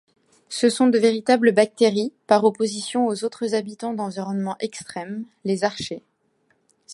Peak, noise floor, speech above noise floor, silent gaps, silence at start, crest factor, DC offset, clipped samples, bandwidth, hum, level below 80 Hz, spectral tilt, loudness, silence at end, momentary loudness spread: -2 dBFS; -67 dBFS; 45 dB; none; 0.5 s; 20 dB; under 0.1%; under 0.1%; 11.5 kHz; none; -68 dBFS; -4.5 dB/octave; -22 LUFS; 0 s; 14 LU